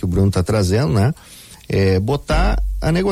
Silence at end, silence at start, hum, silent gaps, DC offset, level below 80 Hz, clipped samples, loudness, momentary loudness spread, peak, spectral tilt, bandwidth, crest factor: 0 s; 0 s; none; none; under 0.1%; -24 dBFS; under 0.1%; -18 LUFS; 9 LU; -4 dBFS; -6.5 dB/octave; 15 kHz; 12 dB